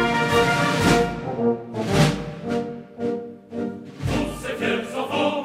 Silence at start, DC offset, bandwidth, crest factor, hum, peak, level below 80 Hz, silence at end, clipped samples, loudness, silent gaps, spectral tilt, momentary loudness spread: 0 s; under 0.1%; 16 kHz; 18 dB; none; -4 dBFS; -42 dBFS; 0 s; under 0.1%; -23 LUFS; none; -5.5 dB/octave; 12 LU